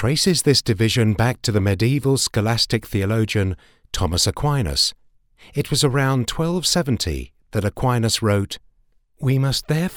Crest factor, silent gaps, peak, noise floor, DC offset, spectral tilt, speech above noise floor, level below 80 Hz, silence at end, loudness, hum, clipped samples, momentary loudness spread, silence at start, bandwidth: 18 dB; none; -2 dBFS; -59 dBFS; under 0.1%; -4.5 dB/octave; 40 dB; -38 dBFS; 0 s; -20 LUFS; none; under 0.1%; 9 LU; 0 s; 18.5 kHz